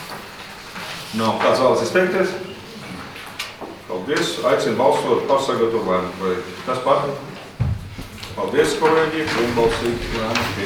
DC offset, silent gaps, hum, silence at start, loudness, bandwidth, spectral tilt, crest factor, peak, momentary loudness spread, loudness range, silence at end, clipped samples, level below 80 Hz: under 0.1%; none; none; 0 s; -20 LUFS; 20 kHz; -5 dB/octave; 18 dB; -2 dBFS; 16 LU; 2 LU; 0 s; under 0.1%; -42 dBFS